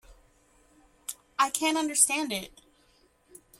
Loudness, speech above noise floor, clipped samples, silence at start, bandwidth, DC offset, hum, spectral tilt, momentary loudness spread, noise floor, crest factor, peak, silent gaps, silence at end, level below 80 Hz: -26 LUFS; 37 dB; under 0.1%; 0.1 s; 16.5 kHz; under 0.1%; none; -0.5 dB/octave; 18 LU; -64 dBFS; 24 dB; -6 dBFS; none; 1.15 s; -64 dBFS